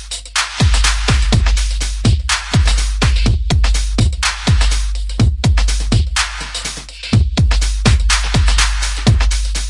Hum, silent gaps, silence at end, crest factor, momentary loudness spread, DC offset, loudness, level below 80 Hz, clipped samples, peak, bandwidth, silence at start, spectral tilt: none; none; 0 s; 14 dB; 5 LU; under 0.1%; -15 LUFS; -16 dBFS; under 0.1%; 0 dBFS; 11.5 kHz; 0 s; -4 dB/octave